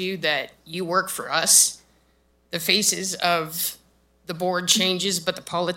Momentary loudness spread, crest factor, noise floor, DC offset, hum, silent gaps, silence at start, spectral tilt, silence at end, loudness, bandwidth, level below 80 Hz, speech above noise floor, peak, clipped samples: 13 LU; 22 dB; -63 dBFS; under 0.1%; none; none; 0 s; -1.5 dB/octave; 0 s; -21 LUFS; 16.5 kHz; -64 dBFS; 39 dB; -2 dBFS; under 0.1%